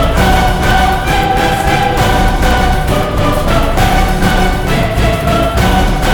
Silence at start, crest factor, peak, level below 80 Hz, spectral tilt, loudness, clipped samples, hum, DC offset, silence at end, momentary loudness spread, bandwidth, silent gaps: 0 s; 10 dB; 0 dBFS; -14 dBFS; -5 dB/octave; -12 LUFS; under 0.1%; none; under 0.1%; 0 s; 3 LU; 20 kHz; none